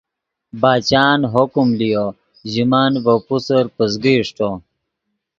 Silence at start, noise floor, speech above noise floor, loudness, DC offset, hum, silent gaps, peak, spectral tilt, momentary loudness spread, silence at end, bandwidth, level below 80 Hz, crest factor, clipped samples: 0.55 s; -75 dBFS; 59 dB; -16 LUFS; under 0.1%; none; none; 0 dBFS; -6 dB/octave; 10 LU; 0.8 s; 7.6 kHz; -52 dBFS; 16 dB; under 0.1%